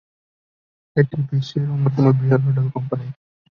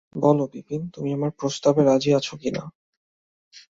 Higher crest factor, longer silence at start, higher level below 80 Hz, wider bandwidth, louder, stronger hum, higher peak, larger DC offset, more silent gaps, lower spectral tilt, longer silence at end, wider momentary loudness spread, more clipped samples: about the same, 18 dB vs 18 dB; first, 0.95 s vs 0.15 s; first, -56 dBFS vs -62 dBFS; second, 6.6 kHz vs 7.8 kHz; first, -20 LUFS vs -23 LUFS; neither; first, -2 dBFS vs -6 dBFS; neither; second, none vs 2.75-3.51 s; first, -9.5 dB/octave vs -6.5 dB/octave; first, 0.4 s vs 0.2 s; about the same, 10 LU vs 12 LU; neither